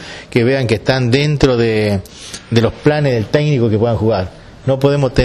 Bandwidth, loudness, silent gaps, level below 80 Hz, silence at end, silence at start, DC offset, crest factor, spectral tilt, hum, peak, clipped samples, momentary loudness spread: 13 kHz; -15 LUFS; none; -32 dBFS; 0 s; 0 s; under 0.1%; 12 dB; -6.5 dB/octave; none; -2 dBFS; under 0.1%; 7 LU